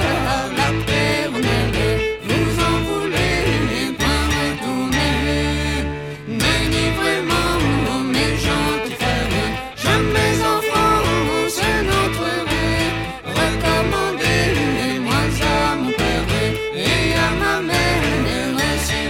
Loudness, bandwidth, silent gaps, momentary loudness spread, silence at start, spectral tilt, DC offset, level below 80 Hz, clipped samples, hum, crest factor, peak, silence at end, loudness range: -18 LUFS; 17.5 kHz; none; 4 LU; 0 s; -4.5 dB/octave; 0.1%; -30 dBFS; under 0.1%; none; 14 dB; -4 dBFS; 0 s; 1 LU